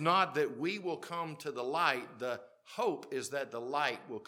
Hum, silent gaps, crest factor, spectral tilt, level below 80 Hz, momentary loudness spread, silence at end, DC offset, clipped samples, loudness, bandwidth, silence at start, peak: none; none; 24 dB; -4 dB/octave; -90 dBFS; 9 LU; 0.05 s; under 0.1%; under 0.1%; -35 LUFS; 17.5 kHz; 0 s; -12 dBFS